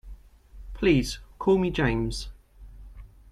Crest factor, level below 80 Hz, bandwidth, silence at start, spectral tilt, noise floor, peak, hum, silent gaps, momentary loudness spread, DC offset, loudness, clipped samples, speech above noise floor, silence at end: 18 dB; -40 dBFS; 13.5 kHz; 0.05 s; -6 dB/octave; -48 dBFS; -8 dBFS; none; none; 15 LU; under 0.1%; -26 LUFS; under 0.1%; 24 dB; 0.25 s